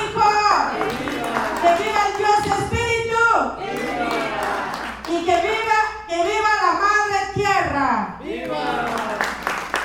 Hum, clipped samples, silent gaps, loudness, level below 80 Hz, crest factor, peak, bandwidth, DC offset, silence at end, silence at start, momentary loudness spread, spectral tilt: none; under 0.1%; none; -20 LUFS; -44 dBFS; 18 dB; -2 dBFS; 18 kHz; under 0.1%; 0 s; 0 s; 8 LU; -4 dB/octave